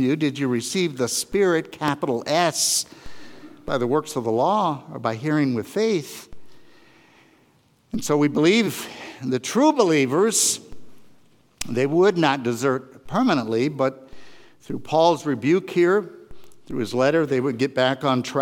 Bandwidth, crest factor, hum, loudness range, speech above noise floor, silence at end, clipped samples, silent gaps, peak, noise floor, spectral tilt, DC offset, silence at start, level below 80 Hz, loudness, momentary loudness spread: 18 kHz; 20 dB; none; 4 LU; 38 dB; 0 s; under 0.1%; none; -2 dBFS; -60 dBFS; -4 dB/octave; under 0.1%; 0 s; -56 dBFS; -21 LUFS; 11 LU